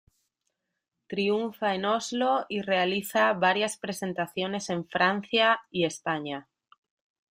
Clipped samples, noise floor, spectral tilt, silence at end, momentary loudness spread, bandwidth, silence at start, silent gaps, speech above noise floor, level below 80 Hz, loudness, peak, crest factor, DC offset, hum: under 0.1%; -83 dBFS; -4 dB/octave; 0.9 s; 9 LU; 15.5 kHz; 1.1 s; none; 56 dB; -72 dBFS; -27 LUFS; -8 dBFS; 20 dB; under 0.1%; none